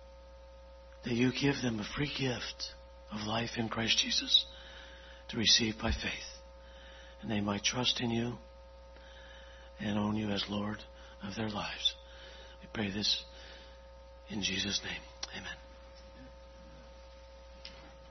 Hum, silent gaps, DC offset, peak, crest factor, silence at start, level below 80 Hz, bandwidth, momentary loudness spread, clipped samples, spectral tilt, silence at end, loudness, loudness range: none; none; under 0.1%; -12 dBFS; 24 dB; 0 s; -52 dBFS; 6.2 kHz; 26 LU; under 0.1%; -2.5 dB/octave; 0 s; -33 LUFS; 9 LU